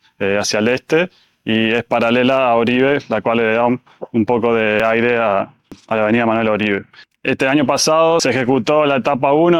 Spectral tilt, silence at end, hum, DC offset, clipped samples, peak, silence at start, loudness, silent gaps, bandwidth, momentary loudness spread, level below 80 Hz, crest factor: -4.5 dB/octave; 0 s; none; under 0.1%; under 0.1%; -2 dBFS; 0.2 s; -16 LUFS; none; 13 kHz; 7 LU; -54 dBFS; 12 dB